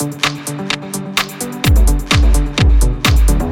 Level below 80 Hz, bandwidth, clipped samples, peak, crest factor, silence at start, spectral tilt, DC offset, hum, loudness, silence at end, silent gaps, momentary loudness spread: -14 dBFS; 17 kHz; under 0.1%; 0 dBFS; 12 dB; 0 s; -4.5 dB/octave; under 0.1%; none; -15 LUFS; 0 s; none; 7 LU